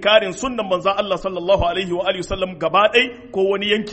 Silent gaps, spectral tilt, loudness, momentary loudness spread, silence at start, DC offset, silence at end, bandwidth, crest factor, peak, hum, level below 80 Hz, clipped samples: none; -4 dB/octave; -19 LUFS; 8 LU; 0 s; under 0.1%; 0 s; 8.8 kHz; 18 dB; 0 dBFS; none; -40 dBFS; under 0.1%